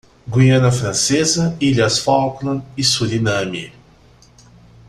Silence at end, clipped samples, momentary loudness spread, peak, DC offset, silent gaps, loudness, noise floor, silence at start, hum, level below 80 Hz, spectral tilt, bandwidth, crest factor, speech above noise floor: 1.2 s; under 0.1%; 10 LU; -2 dBFS; under 0.1%; none; -16 LUFS; -48 dBFS; 0.25 s; none; -46 dBFS; -4.5 dB/octave; 13 kHz; 16 dB; 32 dB